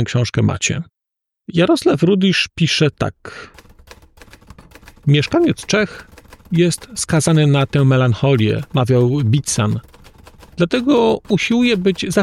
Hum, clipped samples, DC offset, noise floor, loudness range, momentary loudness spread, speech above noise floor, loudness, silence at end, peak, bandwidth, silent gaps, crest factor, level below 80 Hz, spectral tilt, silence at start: none; under 0.1%; under 0.1%; -82 dBFS; 5 LU; 10 LU; 67 dB; -16 LUFS; 0 s; -4 dBFS; 13 kHz; none; 14 dB; -46 dBFS; -5.5 dB/octave; 0 s